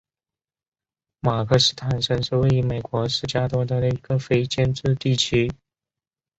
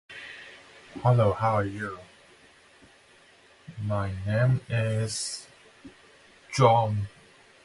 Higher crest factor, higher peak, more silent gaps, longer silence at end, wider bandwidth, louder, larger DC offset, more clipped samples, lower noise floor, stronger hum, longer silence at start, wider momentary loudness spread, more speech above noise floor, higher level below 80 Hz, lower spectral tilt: about the same, 20 dB vs 20 dB; first, -4 dBFS vs -8 dBFS; neither; first, 0.85 s vs 0.55 s; second, 8.2 kHz vs 11.5 kHz; first, -22 LUFS vs -26 LUFS; neither; neither; first, under -90 dBFS vs -57 dBFS; neither; first, 1.25 s vs 0.1 s; second, 6 LU vs 22 LU; first, over 69 dB vs 32 dB; first, -46 dBFS vs -52 dBFS; about the same, -5.5 dB/octave vs -6 dB/octave